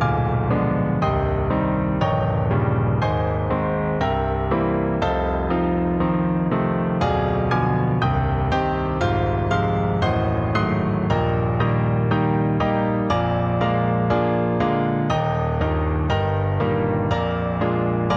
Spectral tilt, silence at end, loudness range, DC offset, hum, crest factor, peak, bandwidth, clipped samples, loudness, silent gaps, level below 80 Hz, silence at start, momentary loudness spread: -8.5 dB/octave; 0 s; 1 LU; under 0.1%; none; 14 dB; -8 dBFS; 7 kHz; under 0.1%; -21 LUFS; none; -34 dBFS; 0 s; 2 LU